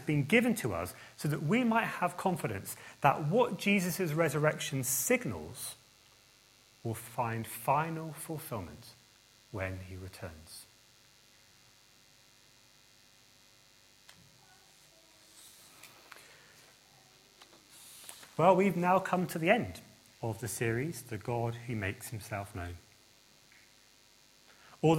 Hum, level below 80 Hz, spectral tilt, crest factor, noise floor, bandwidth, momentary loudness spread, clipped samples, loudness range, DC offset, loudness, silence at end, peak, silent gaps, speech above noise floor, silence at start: none; -68 dBFS; -5 dB/octave; 26 dB; -63 dBFS; 16.5 kHz; 24 LU; under 0.1%; 16 LU; under 0.1%; -33 LUFS; 0 s; -10 dBFS; none; 30 dB; 0 s